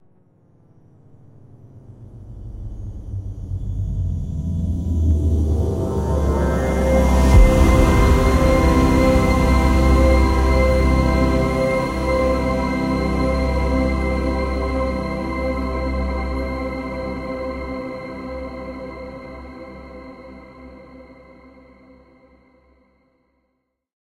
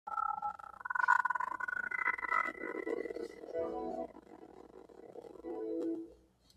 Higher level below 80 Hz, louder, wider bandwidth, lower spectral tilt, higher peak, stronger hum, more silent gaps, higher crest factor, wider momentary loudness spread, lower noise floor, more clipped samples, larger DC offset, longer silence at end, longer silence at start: first, -22 dBFS vs -72 dBFS; first, -19 LUFS vs -37 LUFS; first, 15 kHz vs 13.5 kHz; first, -7 dB/octave vs -5 dB/octave; first, -2 dBFS vs -16 dBFS; neither; neither; second, 18 dB vs 24 dB; second, 19 LU vs 24 LU; first, -73 dBFS vs -62 dBFS; neither; neither; first, 2.9 s vs 0.4 s; first, 1.55 s vs 0.05 s